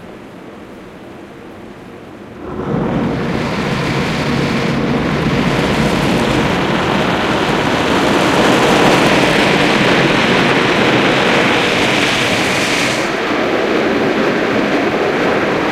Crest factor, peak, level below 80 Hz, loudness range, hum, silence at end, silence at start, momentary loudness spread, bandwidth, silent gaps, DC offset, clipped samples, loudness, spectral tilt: 14 dB; 0 dBFS; -38 dBFS; 8 LU; none; 0 s; 0 s; 22 LU; 16 kHz; none; under 0.1%; under 0.1%; -13 LUFS; -4.5 dB/octave